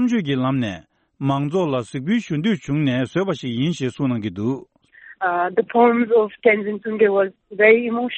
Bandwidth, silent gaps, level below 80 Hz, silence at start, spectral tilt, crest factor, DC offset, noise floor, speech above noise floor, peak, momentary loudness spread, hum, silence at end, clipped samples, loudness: 8.4 kHz; none; -58 dBFS; 0 s; -7 dB/octave; 18 dB; under 0.1%; -47 dBFS; 27 dB; -2 dBFS; 10 LU; none; 0 s; under 0.1%; -20 LUFS